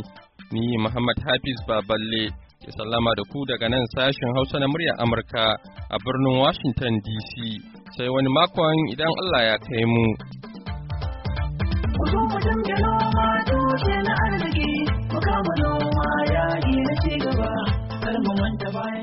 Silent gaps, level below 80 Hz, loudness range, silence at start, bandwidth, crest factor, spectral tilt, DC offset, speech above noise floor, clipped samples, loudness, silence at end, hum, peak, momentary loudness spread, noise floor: none; -34 dBFS; 2 LU; 0 s; 5.8 kHz; 18 dB; -4.5 dB/octave; under 0.1%; 22 dB; under 0.1%; -23 LUFS; 0 s; none; -4 dBFS; 10 LU; -45 dBFS